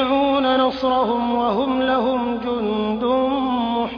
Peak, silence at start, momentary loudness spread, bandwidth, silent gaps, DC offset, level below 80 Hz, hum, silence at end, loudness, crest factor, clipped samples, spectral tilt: -8 dBFS; 0 s; 5 LU; 5.4 kHz; none; under 0.1%; -48 dBFS; none; 0 s; -20 LUFS; 12 dB; under 0.1%; -7 dB/octave